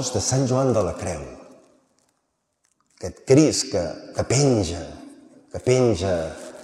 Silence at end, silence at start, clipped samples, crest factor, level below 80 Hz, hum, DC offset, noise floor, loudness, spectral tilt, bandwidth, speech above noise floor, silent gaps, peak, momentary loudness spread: 0 s; 0 s; under 0.1%; 20 dB; -50 dBFS; none; under 0.1%; -73 dBFS; -21 LUFS; -5 dB/octave; 13 kHz; 52 dB; none; -4 dBFS; 19 LU